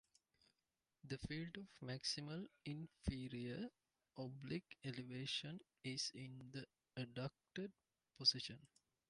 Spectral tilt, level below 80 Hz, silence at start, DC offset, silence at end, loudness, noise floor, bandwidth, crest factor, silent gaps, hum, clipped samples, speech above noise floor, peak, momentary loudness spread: -4 dB/octave; -66 dBFS; 1.05 s; under 0.1%; 0.45 s; -47 LUFS; under -90 dBFS; 11 kHz; 26 dB; none; none; under 0.1%; over 42 dB; -24 dBFS; 12 LU